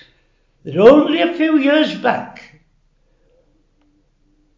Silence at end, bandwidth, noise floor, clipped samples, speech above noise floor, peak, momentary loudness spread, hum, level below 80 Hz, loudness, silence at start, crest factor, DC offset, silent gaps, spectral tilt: 2.25 s; 7.6 kHz; -58 dBFS; 0.1%; 46 dB; 0 dBFS; 16 LU; none; -56 dBFS; -14 LUFS; 0.65 s; 18 dB; under 0.1%; none; -6.5 dB/octave